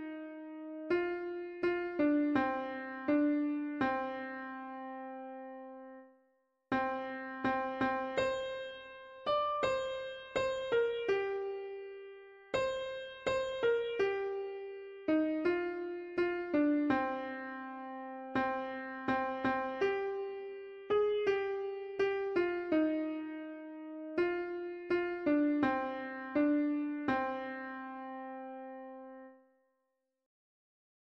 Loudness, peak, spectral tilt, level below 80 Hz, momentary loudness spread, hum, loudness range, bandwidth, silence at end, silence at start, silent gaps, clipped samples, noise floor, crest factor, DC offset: -35 LUFS; -20 dBFS; -5.5 dB/octave; -68 dBFS; 14 LU; none; 6 LU; 7.4 kHz; 1.75 s; 0 s; none; under 0.1%; -84 dBFS; 16 dB; under 0.1%